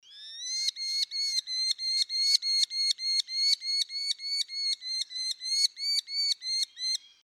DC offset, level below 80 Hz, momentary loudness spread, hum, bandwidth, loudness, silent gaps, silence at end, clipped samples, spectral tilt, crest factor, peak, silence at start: under 0.1%; under -90 dBFS; 7 LU; none; 16 kHz; -27 LUFS; none; 0.3 s; under 0.1%; 8 dB/octave; 20 dB; -10 dBFS; 0.1 s